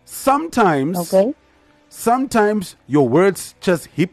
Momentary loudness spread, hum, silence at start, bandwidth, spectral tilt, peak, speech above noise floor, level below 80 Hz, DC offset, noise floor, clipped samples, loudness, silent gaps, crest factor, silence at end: 8 LU; none; 0.1 s; 13 kHz; -5.5 dB/octave; -4 dBFS; 37 dB; -52 dBFS; under 0.1%; -54 dBFS; under 0.1%; -17 LUFS; none; 14 dB; 0.05 s